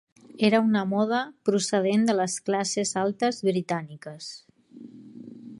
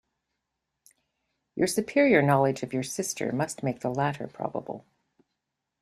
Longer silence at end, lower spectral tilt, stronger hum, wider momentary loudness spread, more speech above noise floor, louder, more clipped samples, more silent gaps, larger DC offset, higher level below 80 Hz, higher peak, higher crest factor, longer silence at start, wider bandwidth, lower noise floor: second, 0.05 s vs 1 s; about the same, -4.5 dB/octave vs -5.5 dB/octave; neither; first, 21 LU vs 15 LU; second, 22 dB vs 57 dB; about the same, -25 LUFS vs -27 LUFS; neither; neither; neither; second, -74 dBFS vs -66 dBFS; about the same, -8 dBFS vs -6 dBFS; about the same, 18 dB vs 22 dB; second, 0.35 s vs 1.55 s; second, 11.5 kHz vs 15 kHz; second, -47 dBFS vs -83 dBFS